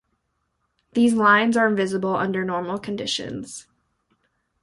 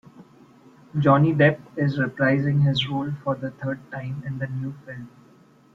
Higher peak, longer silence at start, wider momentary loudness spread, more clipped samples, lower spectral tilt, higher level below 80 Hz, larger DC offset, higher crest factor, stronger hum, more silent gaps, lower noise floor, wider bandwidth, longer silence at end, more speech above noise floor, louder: about the same, -4 dBFS vs -4 dBFS; first, 0.95 s vs 0.2 s; about the same, 16 LU vs 14 LU; neither; second, -4.5 dB/octave vs -8 dB/octave; about the same, -62 dBFS vs -58 dBFS; neither; about the same, 18 dB vs 20 dB; neither; neither; first, -73 dBFS vs -54 dBFS; first, 11.5 kHz vs 6.2 kHz; first, 1 s vs 0.65 s; first, 52 dB vs 31 dB; about the same, -21 LUFS vs -23 LUFS